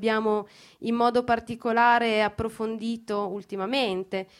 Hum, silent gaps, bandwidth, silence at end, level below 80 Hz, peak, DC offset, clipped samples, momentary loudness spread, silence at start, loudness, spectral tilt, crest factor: none; none; 13 kHz; 0.15 s; -56 dBFS; -8 dBFS; under 0.1%; under 0.1%; 12 LU; 0 s; -26 LUFS; -5.5 dB/octave; 18 dB